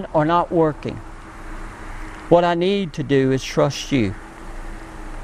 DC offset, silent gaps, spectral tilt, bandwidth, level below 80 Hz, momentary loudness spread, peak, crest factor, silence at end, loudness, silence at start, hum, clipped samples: under 0.1%; none; -6 dB/octave; 14.5 kHz; -36 dBFS; 20 LU; 0 dBFS; 20 dB; 0 s; -19 LUFS; 0 s; none; under 0.1%